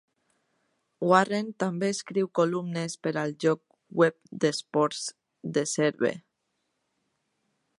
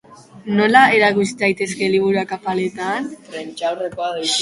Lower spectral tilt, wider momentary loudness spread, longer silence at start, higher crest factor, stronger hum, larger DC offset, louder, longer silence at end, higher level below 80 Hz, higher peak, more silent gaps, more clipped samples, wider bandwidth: about the same, -5 dB/octave vs -4 dB/octave; second, 10 LU vs 14 LU; first, 1 s vs 0.1 s; first, 24 dB vs 18 dB; neither; neither; second, -27 LUFS vs -17 LUFS; first, 1.6 s vs 0 s; second, -78 dBFS vs -60 dBFS; second, -6 dBFS vs 0 dBFS; neither; neither; about the same, 11.5 kHz vs 11.5 kHz